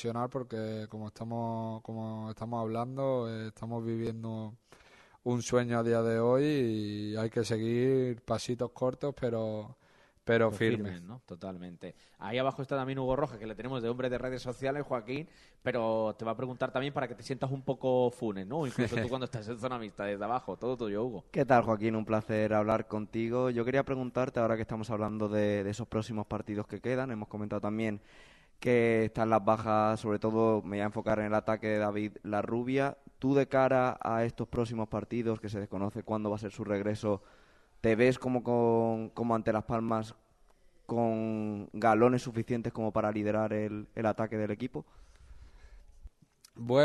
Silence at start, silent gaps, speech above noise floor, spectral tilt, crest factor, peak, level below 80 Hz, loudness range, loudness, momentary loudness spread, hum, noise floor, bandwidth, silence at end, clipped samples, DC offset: 0 s; none; 31 dB; -7 dB/octave; 20 dB; -12 dBFS; -60 dBFS; 5 LU; -32 LUFS; 11 LU; none; -63 dBFS; 12 kHz; 0 s; under 0.1%; under 0.1%